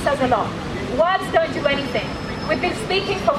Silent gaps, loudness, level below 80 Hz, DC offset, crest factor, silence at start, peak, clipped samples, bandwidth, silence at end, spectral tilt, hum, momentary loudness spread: none; -21 LUFS; -40 dBFS; under 0.1%; 16 dB; 0 s; -4 dBFS; under 0.1%; 14 kHz; 0 s; -5 dB/octave; none; 7 LU